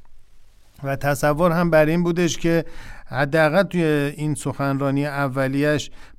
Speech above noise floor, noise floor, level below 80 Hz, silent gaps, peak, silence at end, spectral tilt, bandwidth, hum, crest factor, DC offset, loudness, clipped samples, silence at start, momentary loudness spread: 25 dB; -45 dBFS; -40 dBFS; none; -4 dBFS; 0.05 s; -6 dB/octave; 15.5 kHz; none; 16 dB; under 0.1%; -21 LUFS; under 0.1%; 0 s; 8 LU